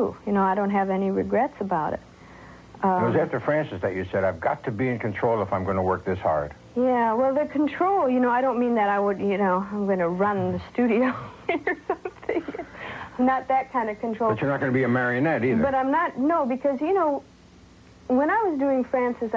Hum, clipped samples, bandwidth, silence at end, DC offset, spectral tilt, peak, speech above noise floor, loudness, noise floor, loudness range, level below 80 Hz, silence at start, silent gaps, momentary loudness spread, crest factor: none; under 0.1%; 7.6 kHz; 0 s; under 0.1%; -8.5 dB/octave; -10 dBFS; 27 dB; -24 LUFS; -51 dBFS; 3 LU; -52 dBFS; 0 s; none; 7 LU; 14 dB